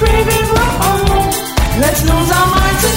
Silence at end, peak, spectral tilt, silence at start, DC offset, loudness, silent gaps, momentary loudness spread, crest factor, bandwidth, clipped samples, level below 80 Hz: 0 s; 0 dBFS; -4 dB/octave; 0 s; under 0.1%; -12 LUFS; none; 4 LU; 10 dB; 16.5 kHz; under 0.1%; -18 dBFS